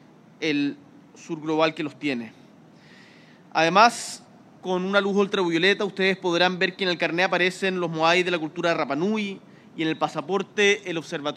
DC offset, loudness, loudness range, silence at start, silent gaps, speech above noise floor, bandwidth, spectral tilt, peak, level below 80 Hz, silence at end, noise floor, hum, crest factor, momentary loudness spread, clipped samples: under 0.1%; -23 LUFS; 4 LU; 0.4 s; none; 27 dB; 13 kHz; -4.5 dB/octave; -2 dBFS; -74 dBFS; 0 s; -51 dBFS; none; 22 dB; 12 LU; under 0.1%